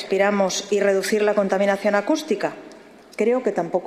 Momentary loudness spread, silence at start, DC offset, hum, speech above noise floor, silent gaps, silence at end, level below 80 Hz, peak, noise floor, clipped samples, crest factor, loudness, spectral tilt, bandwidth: 6 LU; 0 s; under 0.1%; none; 24 dB; none; 0 s; -70 dBFS; -6 dBFS; -44 dBFS; under 0.1%; 16 dB; -21 LUFS; -4.5 dB/octave; 14.5 kHz